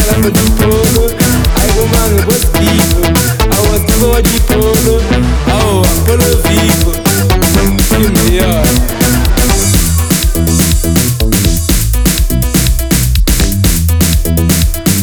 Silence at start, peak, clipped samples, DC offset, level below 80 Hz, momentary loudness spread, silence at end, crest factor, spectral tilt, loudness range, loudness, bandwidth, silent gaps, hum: 0 s; 0 dBFS; 0.2%; under 0.1%; -14 dBFS; 2 LU; 0 s; 8 dB; -4.5 dB/octave; 1 LU; -10 LUFS; over 20 kHz; none; none